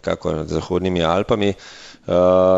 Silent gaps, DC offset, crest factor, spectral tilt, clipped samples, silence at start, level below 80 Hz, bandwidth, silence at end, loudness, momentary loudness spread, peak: none; under 0.1%; 16 dB; -6.5 dB/octave; under 0.1%; 0.05 s; -42 dBFS; 8 kHz; 0 s; -19 LUFS; 17 LU; -2 dBFS